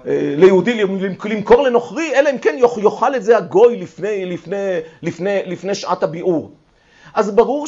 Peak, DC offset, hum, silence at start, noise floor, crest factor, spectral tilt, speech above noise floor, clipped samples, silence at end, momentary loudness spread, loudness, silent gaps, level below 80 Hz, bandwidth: -2 dBFS; under 0.1%; none; 0.05 s; -47 dBFS; 14 dB; -6 dB/octave; 31 dB; under 0.1%; 0 s; 11 LU; -16 LUFS; none; -50 dBFS; 7.8 kHz